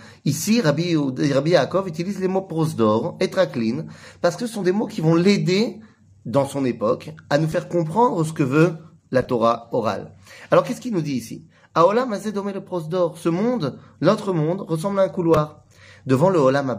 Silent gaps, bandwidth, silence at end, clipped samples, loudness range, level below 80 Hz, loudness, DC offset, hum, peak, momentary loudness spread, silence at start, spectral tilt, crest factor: none; 15.5 kHz; 0 s; under 0.1%; 2 LU; -58 dBFS; -21 LUFS; under 0.1%; none; -2 dBFS; 10 LU; 0 s; -6.5 dB/octave; 18 dB